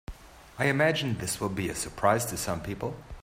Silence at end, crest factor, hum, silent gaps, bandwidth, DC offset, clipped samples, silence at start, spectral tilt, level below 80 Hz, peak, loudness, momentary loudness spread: 0 s; 20 dB; none; none; 16 kHz; under 0.1%; under 0.1%; 0.1 s; -4.5 dB/octave; -50 dBFS; -10 dBFS; -29 LUFS; 12 LU